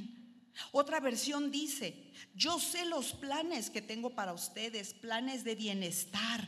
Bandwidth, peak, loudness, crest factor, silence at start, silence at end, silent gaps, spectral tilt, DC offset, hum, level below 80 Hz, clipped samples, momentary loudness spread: 13.5 kHz; -16 dBFS; -37 LUFS; 22 dB; 0 s; 0 s; none; -2.5 dB/octave; under 0.1%; none; -76 dBFS; under 0.1%; 10 LU